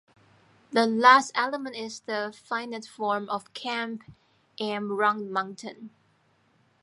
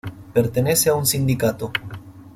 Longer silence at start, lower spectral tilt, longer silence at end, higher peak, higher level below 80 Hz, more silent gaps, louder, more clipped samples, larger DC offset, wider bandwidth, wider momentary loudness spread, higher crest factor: first, 0.7 s vs 0.05 s; about the same, -3.5 dB/octave vs -4.5 dB/octave; first, 0.95 s vs 0.05 s; about the same, -4 dBFS vs -4 dBFS; second, -76 dBFS vs -48 dBFS; neither; second, -26 LUFS vs -20 LUFS; neither; neither; second, 11.5 kHz vs 16.5 kHz; first, 18 LU vs 12 LU; first, 24 dB vs 16 dB